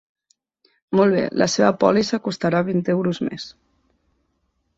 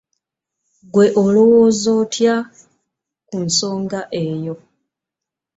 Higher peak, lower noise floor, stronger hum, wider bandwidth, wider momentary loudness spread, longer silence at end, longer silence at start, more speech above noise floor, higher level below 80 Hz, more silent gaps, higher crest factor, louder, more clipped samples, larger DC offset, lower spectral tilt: about the same, -2 dBFS vs -2 dBFS; second, -70 dBFS vs -85 dBFS; neither; about the same, 8 kHz vs 8 kHz; second, 10 LU vs 17 LU; first, 1.25 s vs 1 s; about the same, 0.9 s vs 0.95 s; second, 51 dB vs 69 dB; about the same, -60 dBFS vs -58 dBFS; neither; about the same, 20 dB vs 16 dB; second, -20 LUFS vs -16 LUFS; neither; neither; about the same, -5.5 dB/octave vs -5 dB/octave